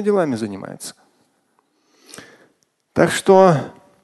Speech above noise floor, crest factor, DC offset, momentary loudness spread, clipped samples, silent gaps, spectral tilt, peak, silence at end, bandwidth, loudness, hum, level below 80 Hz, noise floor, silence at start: 48 dB; 20 dB; under 0.1%; 22 LU; under 0.1%; none; -5.5 dB/octave; 0 dBFS; 0.3 s; 12.5 kHz; -16 LUFS; none; -58 dBFS; -64 dBFS; 0 s